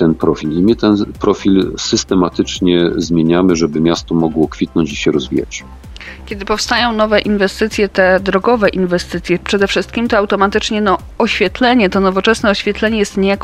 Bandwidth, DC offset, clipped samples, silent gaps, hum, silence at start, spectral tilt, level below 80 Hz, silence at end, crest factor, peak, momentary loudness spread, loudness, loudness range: 13.5 kHz; under 0.1%; under 0.1%; none; none; 0 s; -5 dB/octave; -34 dBFS; 0 s; 14 dB; 0 dBFS; 6 LU; -14 LUFS; 3 LU